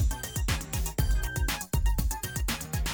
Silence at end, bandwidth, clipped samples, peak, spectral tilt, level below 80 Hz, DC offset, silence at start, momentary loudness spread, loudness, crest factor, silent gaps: 0 s; over 20 kHz; under 0.1%; -14 dBFS; -4 dB/octave; -30 dBFS; under 0.1%; 0 s; 2 LU; -31 LUFS; 14 dB; none